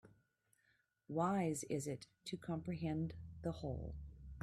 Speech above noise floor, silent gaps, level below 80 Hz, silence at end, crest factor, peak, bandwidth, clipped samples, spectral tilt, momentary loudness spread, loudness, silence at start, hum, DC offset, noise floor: 37 dB; none; -60 dBFS; 0 s; 18 dB; -26 dBFS; 14 kHz; under 0.1%; -6 dB/octave; 11 LU; -43 LUFS; 0.05 s; none; under 0.1%; -79 dBFS